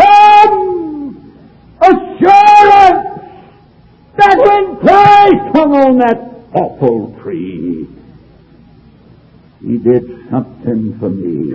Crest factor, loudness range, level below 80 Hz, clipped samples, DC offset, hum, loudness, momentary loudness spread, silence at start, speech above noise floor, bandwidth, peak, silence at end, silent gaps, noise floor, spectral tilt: 10 dB; 12 LU; -44 dBFS; 3%; under 0.1%; none; -9 LUFS; 19 LU; 0 s; 29 dB; 8 kHz; 0 dBFS; 0 s; none; -43 dBFS; -6.5 dB/octave